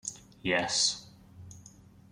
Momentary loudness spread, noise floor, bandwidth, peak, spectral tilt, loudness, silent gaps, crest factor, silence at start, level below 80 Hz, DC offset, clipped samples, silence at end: 24 LU; -55 dBFS; 15.5 kHz; -14 dBFS; -1.5 dB/octave; -29 LUFS; none; 22 dB; 0.05 s; -66 dBFS; under 0.1%; under 0.1%; 0.45 s